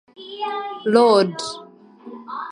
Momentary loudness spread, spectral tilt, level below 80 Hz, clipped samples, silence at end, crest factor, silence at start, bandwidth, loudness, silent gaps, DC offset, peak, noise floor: 23 LU; -5 dB/octave; -72 dBFS; under 0.1%; 0 s; 20 dB; 0.2 s; 11 kHz; -19 LUFS; none; under 0.1%; 0 dBFS; -42 dBFS